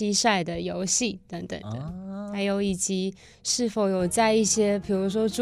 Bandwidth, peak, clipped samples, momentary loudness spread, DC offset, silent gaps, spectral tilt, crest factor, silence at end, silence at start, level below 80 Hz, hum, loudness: 15 kHz; -8 dBFS; under 0.1%; 14 LU; under 0.1%; none; -3.5 dB/octave; 18 dB; 0 s; 0 s; -54 dBFS; none; -25 LUFS